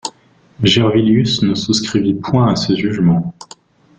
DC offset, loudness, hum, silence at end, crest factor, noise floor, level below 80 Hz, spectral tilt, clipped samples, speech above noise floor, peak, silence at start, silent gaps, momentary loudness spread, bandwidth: under 0.1%; -14 LUFS; none; 0.55 s; 14 dB; -49 dBFS; -46 dBFS; -5.5 dB/octave; under 0.1%; 35 dB; -2 dBFS; 0.05 s; none; 5 LU; 9.4 kHz